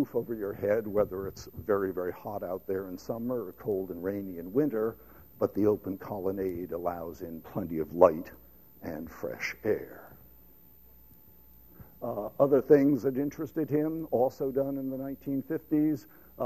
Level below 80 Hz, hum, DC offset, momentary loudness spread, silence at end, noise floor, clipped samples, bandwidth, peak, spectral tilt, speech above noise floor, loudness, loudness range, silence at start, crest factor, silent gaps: -60 dBFS; none; 0.1%; 15 LU; 0 s; -58 dBFS; under 0.1%; 15 kHz; -6 dBFS; -8 dB/octave; 28 dB; -31 LUFS; 9 LU; 0 s; 26 dB; none